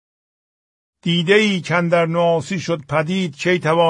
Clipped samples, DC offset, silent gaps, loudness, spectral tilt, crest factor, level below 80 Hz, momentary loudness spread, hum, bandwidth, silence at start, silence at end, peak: under 0.1%; under 0.1%; none; -18 LUFS; -5.5 dB/octave; 16 dB; -60 dBFS; 8 LU; none; 10.5 kHz; 1.05 s; 0 s; -2 dBFS